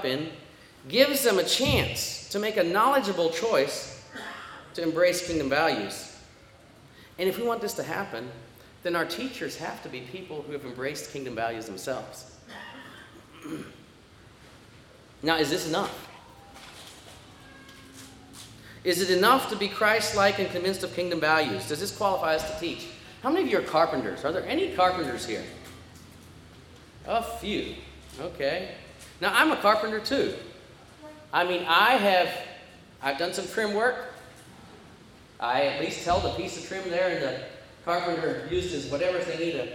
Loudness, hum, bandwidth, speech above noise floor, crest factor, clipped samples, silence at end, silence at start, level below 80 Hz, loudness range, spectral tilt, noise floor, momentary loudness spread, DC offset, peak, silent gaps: -27 LUFS; none; 18 kHz; 26 dB; 22 dB; under 0.1%; 0 s; 0 s; -56 dBFS; 11 LU; -3.5 dB/octave; -53 dBFS; 23 LU; under 0.1%; -6 dBFS; none